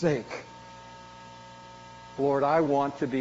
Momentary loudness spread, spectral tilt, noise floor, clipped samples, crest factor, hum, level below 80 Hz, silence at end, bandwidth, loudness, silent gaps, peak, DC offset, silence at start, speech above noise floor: 22 LU; -6 dB/octave; -47 dBFS; under 0.1%; 18 dB; 60 Hz at -55 dBFS; -64 dBFS; 0 s; 7.6 kHz; -27 LUFS; none; -12 dBFS; under 0.1%; 0 s; 21 dB